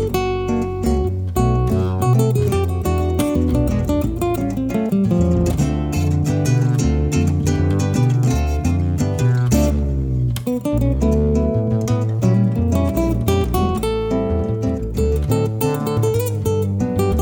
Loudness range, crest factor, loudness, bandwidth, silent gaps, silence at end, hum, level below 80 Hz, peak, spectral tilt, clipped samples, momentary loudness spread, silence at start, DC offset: 2 LU; 14 dB; -19 LUFS; 19 kHz; none; 0 s; none; -26 dBFS; -4 dBFS; -7.5 dB/octave; under 0.1%; 4 LU; 0 s; under 0.1%